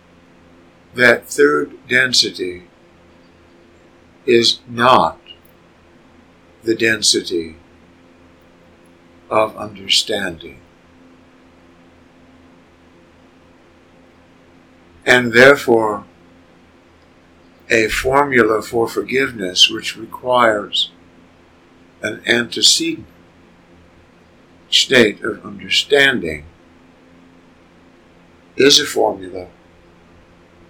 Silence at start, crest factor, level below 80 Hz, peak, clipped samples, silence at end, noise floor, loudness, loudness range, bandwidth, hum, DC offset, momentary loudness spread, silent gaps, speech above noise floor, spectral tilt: 0.95 s; 18 dB; -50 dBFS; 0 dBFS; 0.1%; 1.25 s; -49 dBFS; -15 LUFS; 6 LU; 19 kHz; none; under 0.1%; 16 LU; none; 33 dB; -2.5 dB/octave